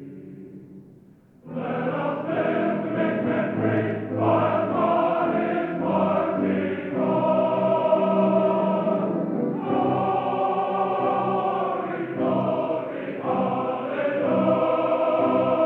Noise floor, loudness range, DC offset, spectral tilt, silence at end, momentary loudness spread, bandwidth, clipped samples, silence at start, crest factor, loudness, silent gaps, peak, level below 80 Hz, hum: -52 dBFS; 3 LU; under 0.1%; -10 dB/octave; 0 s; 6 LU; 4.5 kHz; under 0.1%; 0 s; 14 dB; -23 LUFS; none; -8 dBFS; -68 dBFS; none